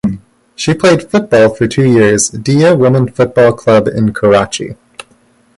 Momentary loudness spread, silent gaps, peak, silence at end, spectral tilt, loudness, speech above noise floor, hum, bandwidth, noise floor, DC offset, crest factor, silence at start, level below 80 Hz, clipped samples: 10 LU; none; 0 dBFS; 0.85 s; -5.5 dB/octave; -10 LUFS; 40 dB; none; 11.5 kHz; -50 dBFS; under 0.1%; 10 dB; 0.05 s; -42 dBFS; under 0.1%